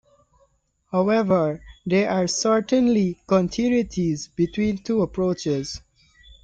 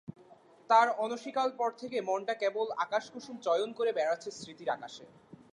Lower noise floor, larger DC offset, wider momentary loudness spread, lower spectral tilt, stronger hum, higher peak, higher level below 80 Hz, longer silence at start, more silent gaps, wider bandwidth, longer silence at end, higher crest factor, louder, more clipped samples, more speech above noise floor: first, -65 dBFS vs -59 dBFS; neither; second, 7 LU vs 15 LU; first, -5.5 dB/octave vs -3.5 dB/octave; neither; first, -6 dBFS vs -12 dBFS; first, -50 dBFS vs -80 dBFS; first, 0.95 s vs 0.1 s; neither; second, 9 kHz vs 11 kHz; first, 0.65 s vs 0.15 s; about the same, 16 dB vs 20 dB; first, -22 LUFS vs -32 LUFS; neither; first, 43 dB vs 27 dB